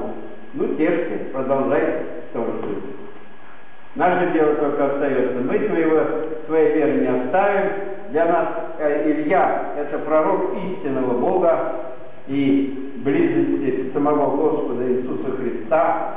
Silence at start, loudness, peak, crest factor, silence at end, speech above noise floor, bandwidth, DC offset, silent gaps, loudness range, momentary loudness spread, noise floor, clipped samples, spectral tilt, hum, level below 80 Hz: 0 s; -21 LUFS; -8 dBFS; 12 dB; 0 s; 26 dB; 3.9 kHz; 4%; none; 4 LU; 10 LU; -45 dBFS; under 0.1%; -10.5 dB/octave; none; -64 dBFS